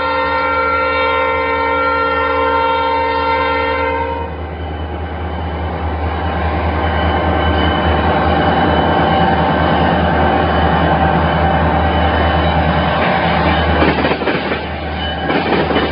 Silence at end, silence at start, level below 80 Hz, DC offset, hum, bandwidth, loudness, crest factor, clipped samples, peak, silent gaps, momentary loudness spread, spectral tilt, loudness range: 0 s; 0 s; -24 dBFS; under 0.1%; none; 5.4 kHz; -15 LUFS; 14 dB; under 0.1%; 0 dBFS; none; 8 LU; -10.5 dB/octave; 5 LU